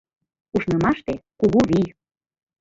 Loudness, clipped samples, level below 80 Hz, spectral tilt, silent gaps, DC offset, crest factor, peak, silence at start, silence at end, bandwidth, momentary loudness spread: -21 LUFS; under 0.1%; -48 dBFS; -7.5 dB/octave; none; under 0.1%; 18 dB; -4 dBFS; 0.55 s; 0.75 s; 7.8 kHz; 10 LU